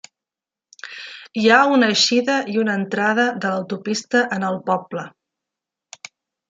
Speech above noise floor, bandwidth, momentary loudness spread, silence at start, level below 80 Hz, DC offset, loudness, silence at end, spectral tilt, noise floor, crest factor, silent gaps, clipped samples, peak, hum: 70 dB; 9.4 kHz; 22 LU; 0.85 s; -70 dBFS; under 0.1%; -18 LUFS; 1.4 s; -3.5 dB/octave; -89 dBFS; 20 dB; none; under 0.1%; -2 dBFS; none